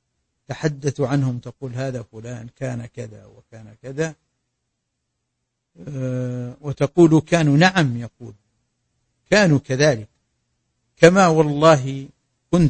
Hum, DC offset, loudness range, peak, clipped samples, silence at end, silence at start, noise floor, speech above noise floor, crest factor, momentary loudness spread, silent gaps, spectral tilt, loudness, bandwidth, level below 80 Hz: none; under 0.1%; 15 LU; 0 dBFS; under 0.1%; 0 s; 0.5 s; -77 dBFS; 58 dB; 20 dB; 20 LU; none; -6 dB/octave; -18 LUFS; 8.8 kHz; -50 dBFS